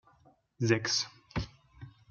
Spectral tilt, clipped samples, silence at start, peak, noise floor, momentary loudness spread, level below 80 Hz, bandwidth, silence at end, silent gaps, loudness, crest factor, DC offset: -4 dB/octave; under 0.1%; 0.6 s; -12 dBFS; -65 dBFS; 25 LU; -54 dBFS; 7.4 kHz; 0.2 s; none; -32 LUFS; 22 dB; under 0.1%